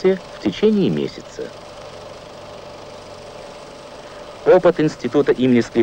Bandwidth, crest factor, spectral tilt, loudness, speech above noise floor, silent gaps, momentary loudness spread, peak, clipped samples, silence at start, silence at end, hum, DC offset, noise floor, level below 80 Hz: 9.8 kHz; 16 dB; -6.5 dB/octave; -17 LUFS; 20 dB; none; 22 LU; -4 dBFS; under 0.1%; 0 s; 0 s; none; under 0.1%; -37 dBFS; -50 dBFS